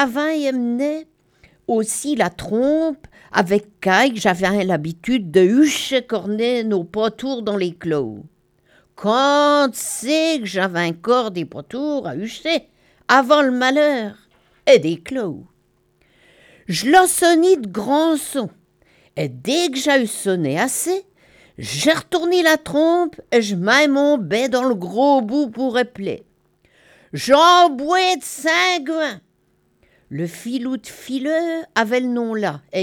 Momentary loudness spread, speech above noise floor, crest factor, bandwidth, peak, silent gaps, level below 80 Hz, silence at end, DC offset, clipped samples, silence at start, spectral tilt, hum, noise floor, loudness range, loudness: 13 LU; 44 dB; 18 dB; 18.5 kHz; 0 dBFS; none; -58 dBFS; 0 s; under 0.1%; under 0.1%; 0 s; -4 dB/octave; none; -62 dBFS; 4 LU; -18 LUFS